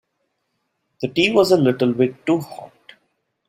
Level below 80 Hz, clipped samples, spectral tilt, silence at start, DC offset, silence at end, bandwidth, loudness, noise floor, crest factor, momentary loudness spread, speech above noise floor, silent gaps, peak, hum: -60 dBFS; under 0.1%; -6 dB/octave; 1 s; under 0.1%; 0.85 s; 16 kHz; -18 LUFS; -73 dBFS; 18 dB; 16 LU; 55 dB; none; -2 dBFS; none